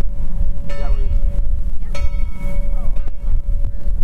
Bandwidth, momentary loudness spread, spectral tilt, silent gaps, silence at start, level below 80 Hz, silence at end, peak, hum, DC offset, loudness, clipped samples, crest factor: 2.9 kHz; 5 LU; -7.5 dB/octave; none; 0 s; -16 dBFS; 0 s; -4 dBFS; none; under 0.1%; -25 LUFS; under 0.1%; 8 dB